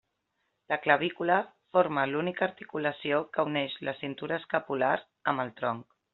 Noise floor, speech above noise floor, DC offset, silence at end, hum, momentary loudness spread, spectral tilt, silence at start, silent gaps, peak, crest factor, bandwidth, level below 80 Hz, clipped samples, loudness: -79 dBFS; 49 dB; under 0.1%; 0.3 s; none; 8 LU; -3 dB/octave; 0.7 s; none; -6 dBFS; 24 dB; 4.3 kHz; -74 dBFS; under 0.1%; -30 LUFS